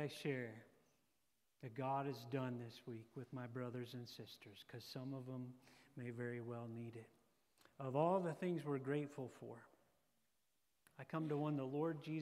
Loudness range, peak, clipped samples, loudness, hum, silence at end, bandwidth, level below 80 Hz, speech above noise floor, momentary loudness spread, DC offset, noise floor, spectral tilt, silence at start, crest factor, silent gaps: 7 LU; -24 dBFS; under 0.1%; -46 LUFS; none; 0 s; 15 kHz; under -90 dBFS; 41 dB; 15 LU; under 0.1%; -87 dBFS; -7.5 dB/octave; 0 s; 22 dB; none